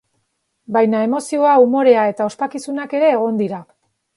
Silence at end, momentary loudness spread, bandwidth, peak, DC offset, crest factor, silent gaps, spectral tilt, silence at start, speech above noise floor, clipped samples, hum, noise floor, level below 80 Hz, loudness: 0.55 s; 12 LU; 11.5 kHz; 0 dBFS; under 0.1%; 16 dB; none; -6 dB/octave; 0.7 s; 54 dB; under 0.1%; none; -69 dBFS; -70 dBFS; -16 LUFS